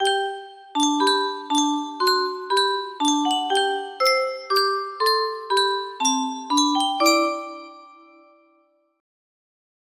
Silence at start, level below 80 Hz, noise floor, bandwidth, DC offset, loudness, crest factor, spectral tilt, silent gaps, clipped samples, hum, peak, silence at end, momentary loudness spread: 0 s; -74 dBFS; -63 dBFS; 15.5 kHz; under 0.1%; -21 LUFS; 18 dB; 0 dB/octave; none; under 0.1%; none; -4 dBFS; 2.1 s; 6 LU